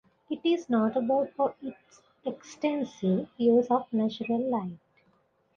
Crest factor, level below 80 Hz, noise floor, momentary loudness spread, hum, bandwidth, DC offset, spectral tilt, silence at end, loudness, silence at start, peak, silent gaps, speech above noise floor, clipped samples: 16 dB; -72 dBFS; -68 dBFS; 14 LU; none; 7.2 kHz; under 0.1%; -7 dB/octave; 0.8 s; -28 LUFS; 0.3 s; -12 dBFS; none; 40 dB; under 0.1%